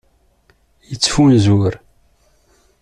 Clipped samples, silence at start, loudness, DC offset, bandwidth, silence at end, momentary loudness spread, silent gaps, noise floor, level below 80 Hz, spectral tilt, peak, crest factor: under 0.1%; 0.9 s; -14 LUFS; under 0.1%; 11 kHz; 1.05 s; 20 LU; none; -56 dBFS; -40 dBFS; -5.5 dB/octave; 0 dBFS; 16 dB